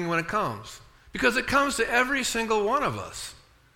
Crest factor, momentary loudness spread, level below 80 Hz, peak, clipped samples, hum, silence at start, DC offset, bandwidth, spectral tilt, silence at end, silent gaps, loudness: 20 dB; 16 LU; -50 dBFS; -8 dBFS; under 0.1%; none; 0 s; under 0.1%; 17 kHz; -3.5 dB/octave; 0.4 s; none; -25 LUFS